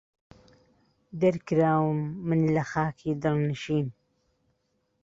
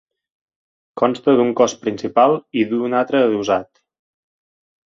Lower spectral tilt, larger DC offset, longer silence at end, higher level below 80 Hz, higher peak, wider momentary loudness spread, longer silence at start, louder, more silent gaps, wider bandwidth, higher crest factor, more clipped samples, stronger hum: first, -8 dB/octave vs -5 dB/octave; neither; about the same, 1.15 s vs 1.25 s; about the same, -60 dBFS vs -62 dBFS; second, -12 dBFS vs -2 dBFS; about the same, 6 LU vs 6 LU; first, 1.15 s vs 0.95 s; second, -27 LUFS vs -18 LUFS; neither; about the same, 7.6 kHz vs 7.6 kHz; about the same, 18 dB vs 18 dB; neither; neither